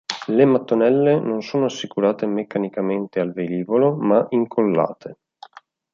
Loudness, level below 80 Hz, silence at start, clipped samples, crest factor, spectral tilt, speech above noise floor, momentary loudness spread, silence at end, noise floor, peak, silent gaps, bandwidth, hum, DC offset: -20 LUFS; -68 dBFS; 0.1 s; under 0.1%; 18 dB; -7 dB/octave; 27 dB; 8 LU; 0.8 s; -46 dBFS; -2 dBFS; none; 7.4 kHz; none; under 0.1%